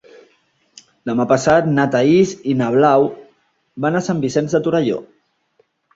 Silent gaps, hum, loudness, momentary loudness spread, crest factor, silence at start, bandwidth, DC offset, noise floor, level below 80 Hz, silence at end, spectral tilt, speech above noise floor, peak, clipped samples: none; none; -16 LUFS; 9 LU; 16 dB; 1.05 s; 7.8 kHz; under 0.1%; -61 dBFS; -54 dBFS; 0.95 s; -6.5 dB/octave; 46 dB; -2 dBFS; under 0.1%